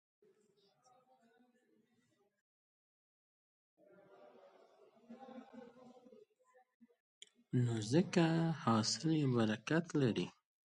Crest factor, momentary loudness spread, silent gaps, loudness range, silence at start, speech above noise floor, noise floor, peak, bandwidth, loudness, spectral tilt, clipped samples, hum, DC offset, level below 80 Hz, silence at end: 22 dB; 21 LU; 6.74-6.80 s, 7.00-7.21 s; 25 LU; 5.1 s; 44 dB; -78 dBFS; -20 dBFS; 11 kHz; -36 LUFS; -5.5 dB/octave; under 0.1%; none; under 0.1%; -78 dBFS; 0.35 s